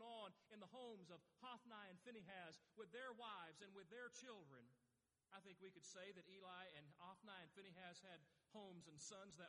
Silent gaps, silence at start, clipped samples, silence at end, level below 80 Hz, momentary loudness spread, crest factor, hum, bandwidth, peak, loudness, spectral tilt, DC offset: none; 0 s; under 0.1%; 0 s; under -90 dBFS; 8 LU; 18 dB; none; 11 kHz; -44 dBFS; -61 LUFS; -3 dB/octave; under 0.1%